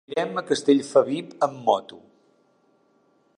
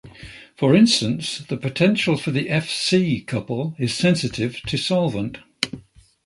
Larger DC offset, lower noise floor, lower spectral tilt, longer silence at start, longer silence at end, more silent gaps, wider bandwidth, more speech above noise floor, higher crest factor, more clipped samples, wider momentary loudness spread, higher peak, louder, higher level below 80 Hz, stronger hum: neither; first, -64 dBFS vs -47 dBFS; about the same, -5 dB/octave vs -5 dB/octave; about the same, 0.1 s vs 0.05 s; first, 1.4 s vs 0.45 s; neither; about the same, 10.5 kHz vs 11.5 kHz; first, 41 dB vs 27 dB; about the same, 22 dB vs 22 dB; neither; second, 8 LU vs 11 LU; second, -4 dBFS vs 0 dBFS; about the same, -23 LUFS vs -21 LUFS; second, -76 dBFS vs -52 dBFS; neither